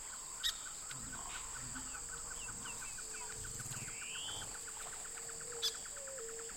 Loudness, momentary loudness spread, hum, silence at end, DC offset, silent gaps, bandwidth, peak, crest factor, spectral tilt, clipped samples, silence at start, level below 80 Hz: -42 LUFS; 6 LU; none; 0 s; under 0.1%; none; 16.5 kHz; -24 dBFS; 22 dB; -0.5 dB/octave; under 0.1%; 0 s; -60 dBFS